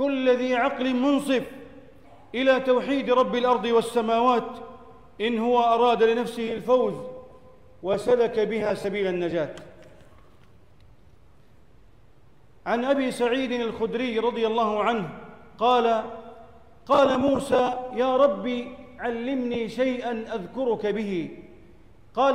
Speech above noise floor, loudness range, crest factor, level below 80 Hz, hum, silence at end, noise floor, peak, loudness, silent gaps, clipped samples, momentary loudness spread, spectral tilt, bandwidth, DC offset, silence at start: 33 dB; 6 LU; 16 dB; -58 dBFS; none; 0 s; -57 dBFS; -10 dBFS; -24 LUFS; none; under 0.1%; 14 LU; -5.5 dB/octave; 13 kHz; 0.3%; 0 s